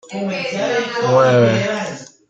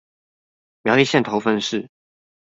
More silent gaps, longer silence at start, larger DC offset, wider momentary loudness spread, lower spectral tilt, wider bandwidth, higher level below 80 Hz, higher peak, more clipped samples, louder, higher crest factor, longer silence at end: neither; second, 0.05 s vs 0.85 s; neither; about the same, 11 LU vs 11 LU; about the same, -5.5 dB/octave vs -4.5 dB/octave; about the same, 8 kHz vs 7.8 kHz; about the same, -58 dBFS vs -62 dBFS; about the same, -2 dBFS vs -2 dBFS; neither; first, -16 LUFS vs -19 LUFS; about the same, 16 dB vs 20 dB; second, 0.25 s vs 0.65 s